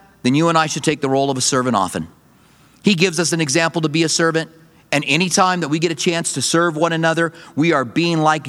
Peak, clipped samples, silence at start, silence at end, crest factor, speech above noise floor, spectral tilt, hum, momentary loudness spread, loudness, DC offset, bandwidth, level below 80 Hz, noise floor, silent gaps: 0 dBFS; under 0.1%; 0.25 s; 0 s; 18 dB; 33 dB; -4 dB/octave; none; 6 LU; -17 LUFS; under 0.1%; 14.5 kHz; -60 dBFS; -51 dBFS; none